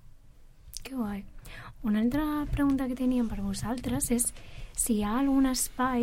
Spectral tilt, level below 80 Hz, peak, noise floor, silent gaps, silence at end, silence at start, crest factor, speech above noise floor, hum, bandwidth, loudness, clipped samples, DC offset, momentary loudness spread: -4.5 dB/octave; -42 dBFS; -14 dBFS; -52 dBFS; none; 0 s; 0.05 s; 16 dB; 24 dB; none; 16.5 kHz; -29 LUFS; under 0.1%; under 0.1%; 16 LU